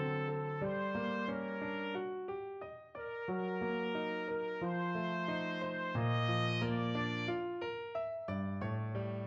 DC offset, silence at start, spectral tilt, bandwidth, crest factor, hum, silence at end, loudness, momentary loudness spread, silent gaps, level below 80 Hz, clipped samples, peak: under 0.1%; 0 s; -7.5 dB/octave; 7.4 kHz; 16 dB; none; 0 s; -38 LUFS; 7 LU; none; -68 dBFS; under 0.1%; -22 dBFS